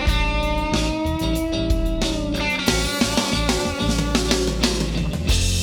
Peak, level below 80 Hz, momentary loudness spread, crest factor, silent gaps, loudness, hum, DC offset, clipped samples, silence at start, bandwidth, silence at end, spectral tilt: -4 dBFS; -26 dBFS; 3 LU; 18 dB; none; -21 LUFS; none; under 0.1%; under 0.1%; 0 s; 19.5 kHz; 0 s; -4 dB/octave